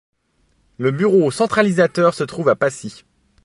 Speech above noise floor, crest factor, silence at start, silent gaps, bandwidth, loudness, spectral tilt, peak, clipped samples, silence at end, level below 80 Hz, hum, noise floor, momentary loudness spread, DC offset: 46 dB; 16 dB; 0.8 s; none; 11.5 kHz; -17 LUFS; -6 dB/octave; -2 dBFS; under 0.1%; 0.5 s; -58 dBFS; none; -62 dBFS; 7 LU; under 0.1%